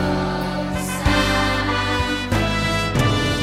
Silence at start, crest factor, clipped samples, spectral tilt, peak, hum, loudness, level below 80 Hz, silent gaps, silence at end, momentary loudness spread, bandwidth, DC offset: 0 s; 16 dB; under 0.1%; -5 dB/octave; -4 dBFS; none; -20 LUFS; -30 dBFS; none; 0 s; 6 LU; 16 kHz; under 0.1%